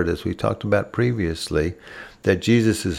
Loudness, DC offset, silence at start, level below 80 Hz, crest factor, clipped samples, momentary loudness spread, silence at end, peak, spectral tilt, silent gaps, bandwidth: -22 LUFS; under 0.1%; 0 s; -42 dBFS; 18 dB; under 0.1%; 9 LU; 0 s; -4 dBFS; -6 dB/octave; none; 16 kHz